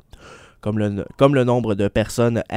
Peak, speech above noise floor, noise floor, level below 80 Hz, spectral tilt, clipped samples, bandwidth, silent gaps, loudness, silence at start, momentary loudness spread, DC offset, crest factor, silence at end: 0 dBFS; 25 dB; -44 dBFS; -44 dBFS; -7 dB/octave; under 0.1%; 16 kHz; none; -19 LUFS; 0.25 s; 9 LU; under 0.1%; 20 dB; 0 s